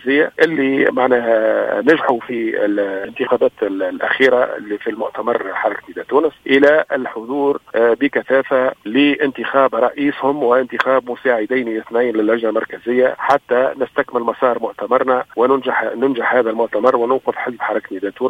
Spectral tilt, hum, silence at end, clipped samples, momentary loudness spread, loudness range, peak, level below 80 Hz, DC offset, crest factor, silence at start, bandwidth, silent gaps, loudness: -6 dB/octave; none; 0 s; under 0.1%; 7 LU; 2 LU; 0 dBFS; -60 dBFS; under 0.1%; 16 dB; 0.05 s; 8.4 kHz; none; -16 LUFS